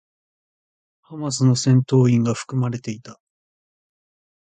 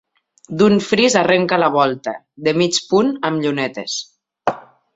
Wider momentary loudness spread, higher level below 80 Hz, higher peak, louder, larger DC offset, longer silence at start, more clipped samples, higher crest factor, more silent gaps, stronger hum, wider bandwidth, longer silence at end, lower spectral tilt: first, 16 LU vs 12 LU; about the same, -58 dBFS vs -58 dBFS; second, -4 dBFS vs 0 dBFS; about the same, -19 LUFS vs -17 LUFS; neither; first, 1.1 s vs 0.5 s; neither; about the same, 18 dB vs 18 dB; neither; neither; first, 9.4 kHz vs 8 kHz; first, 1.45 s vs 0.35 s; first, -6.5 dB/octave vs -4.5 dB/octave